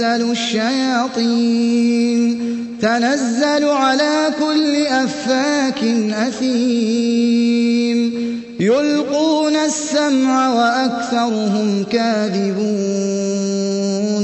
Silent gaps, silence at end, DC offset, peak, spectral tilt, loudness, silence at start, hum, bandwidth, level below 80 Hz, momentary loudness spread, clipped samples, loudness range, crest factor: none; 0 s; under 0.1%; -4 dBFS; -4.5 dB/octave; -17 LUFS; 0 s; none; 8.4 kHz; -62 dBFS; 4 LU; under 0.1%; 1 LU; 12 dB